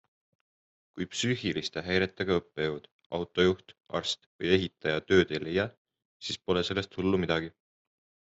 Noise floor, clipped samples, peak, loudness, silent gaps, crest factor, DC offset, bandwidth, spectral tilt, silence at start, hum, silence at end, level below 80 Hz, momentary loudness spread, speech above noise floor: under -90 dBFS; under 0.1%; -10 dBFS; -30 LUFS; 2.92-2.99 s, 3.06-3.10 s, 4.26-4.39 s, 5.77-5.85 s, 6.05-6.20 s; 22 dB; under 0.1%; 8.2 kHz; -5 dB/octave; 0.95 s; none; 0.8 s; -64 dBFS; 11 LU; over 60 dB